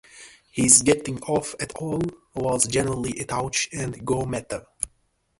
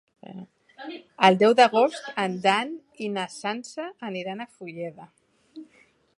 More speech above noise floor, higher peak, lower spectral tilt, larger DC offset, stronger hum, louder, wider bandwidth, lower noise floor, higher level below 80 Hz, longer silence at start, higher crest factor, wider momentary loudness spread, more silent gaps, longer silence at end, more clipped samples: first, 44 dB vs 36 dB; about the same, 0 dBFS vs -2 dBFS; about the same, -3.5 dB/octave vs -4.5 dB/octave; neither; neither; about the same, -23 LUFS vs -23 LUFS; about the same, 12 kHz vs 11.5 kHz; first, -68 dBFS vs -60 dBFS; first, -50 dBFS vs -78 dBFS; second, 0.15 s vs 0.3 s; about the same, 24 dB vs 24 dB; second, 16 LU vs 23 LU; neither; about the same, 0.55 s vs 0.55 s; neither